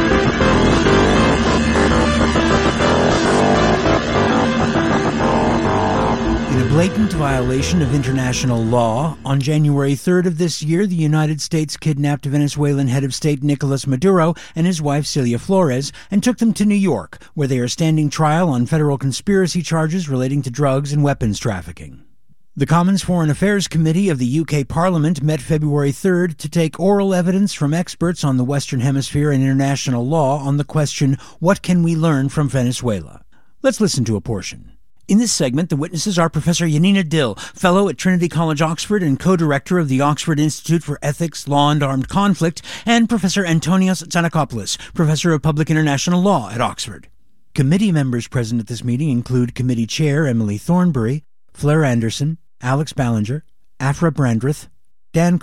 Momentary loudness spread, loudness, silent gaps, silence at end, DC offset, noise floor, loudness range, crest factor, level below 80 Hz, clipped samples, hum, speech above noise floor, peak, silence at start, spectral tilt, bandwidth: 6 LU; -17 LUFS; none; 0.05 s; 0.8%; -60 dBFS; 4 LU; 16 dB; -36 dBFS; under 0.1%; none; 43 dB; -2 dBFS; 0 s; -6 dB/octave; 14 kHz